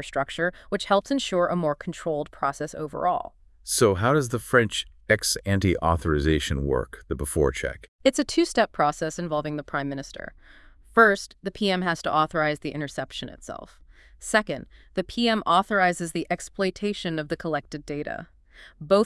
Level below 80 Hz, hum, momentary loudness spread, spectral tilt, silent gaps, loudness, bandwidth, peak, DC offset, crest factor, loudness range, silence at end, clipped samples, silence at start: -44 dBFS; none; 13 LU; -4.5 dB/octave; 7.88-7.99 s; -25 LUFS; 12 kHz; -4 dBFS; under 0.1%; 22 dB; 4 LU; 0 s; under 0.1%; 0 s